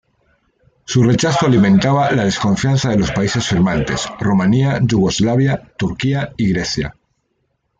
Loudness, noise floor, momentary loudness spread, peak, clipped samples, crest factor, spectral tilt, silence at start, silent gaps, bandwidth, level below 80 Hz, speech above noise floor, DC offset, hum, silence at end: -16 LUFS; -67 dBFS; 7 LU; -2 dBFS; under 0.1%; 12 dB; -6 dB/octave; 0.9 s; none; 9 kHz; -40 dBFS; 53 dB; under 0.1%; none; 0.9 s